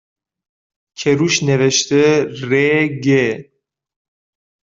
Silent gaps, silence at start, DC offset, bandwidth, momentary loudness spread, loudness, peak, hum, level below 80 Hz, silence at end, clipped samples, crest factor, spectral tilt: none; 1 s; under 0.1%; 7.8 kHz; 6 LU; -15 LUFS; -2 dBFS; none; -58 dBFS; 1.3 s; under 0.1%; 16 dB; -4.5 dB/octave